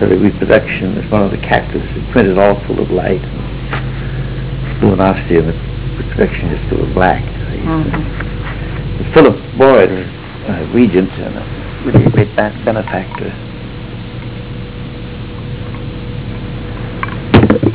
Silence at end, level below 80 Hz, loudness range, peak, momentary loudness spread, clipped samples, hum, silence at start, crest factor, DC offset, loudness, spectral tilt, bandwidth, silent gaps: 0 s; -26 dBFS; 11 LU; 0 dBFS; 16 LU; under 0.1%; none; 0 s; 14 dB; 0.7%; -14 LUFS; -11.5 dB/octave; 4 kHz; none